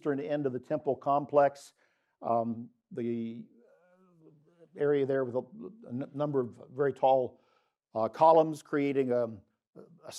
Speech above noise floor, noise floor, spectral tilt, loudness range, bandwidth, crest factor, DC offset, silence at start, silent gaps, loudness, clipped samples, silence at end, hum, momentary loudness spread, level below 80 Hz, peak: 43 dB; -73 dBFS; -7.5 dB/octave; 7 LU; 12.5 kHz; 20 dB; under 0.1%; 0.05 s; 9.67-9.73 s; -30 LUFS; under 0.1%; 0 s; none; 15 LU; -86 dBFS; -10 dBFS